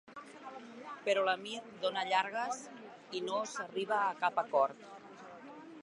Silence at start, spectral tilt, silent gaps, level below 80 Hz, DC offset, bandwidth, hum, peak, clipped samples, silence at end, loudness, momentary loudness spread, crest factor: 0.05 s; -2.5 dB/octave; none; -90 dBFS; under 0.1%; 11.5 kHz; none; -14 dBFS; under 0.1%; 0 s; -35 LUFS; 19 LU; 22 dB